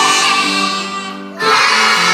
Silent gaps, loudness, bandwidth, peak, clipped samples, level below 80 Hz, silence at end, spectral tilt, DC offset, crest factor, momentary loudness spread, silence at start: none; -12 LUFS; 15.5 kHz; 0 dBFS; under 0.1%; -76 dBFS; 0 s; -1 dB/octave; under 0.1%; 14 dB; 13 LU; 0 s